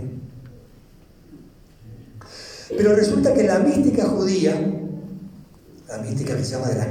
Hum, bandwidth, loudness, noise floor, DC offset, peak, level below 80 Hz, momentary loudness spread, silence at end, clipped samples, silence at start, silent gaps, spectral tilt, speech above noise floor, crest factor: none; 15.5 kHz; -20 LUFS; -49 dBFS; under 0.1%; -6 dBFS; -50 dBFS; 22 LU; 0 s; under 0.1%; 0 s; none; -6.5 dB/octave; 30 dB; 16 dB